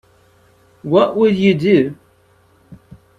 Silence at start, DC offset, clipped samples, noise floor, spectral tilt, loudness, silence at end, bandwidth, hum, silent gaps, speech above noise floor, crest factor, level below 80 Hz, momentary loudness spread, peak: 0.85 s; under 0.1%; under 0.1%; -54 dBFS; -8 dB/octave; -15 LUFS; 0.45 s; 7.8 kHz; none; none; 40 dB; 18 dB; -56 dBFS; 9 LU; 0 dBFS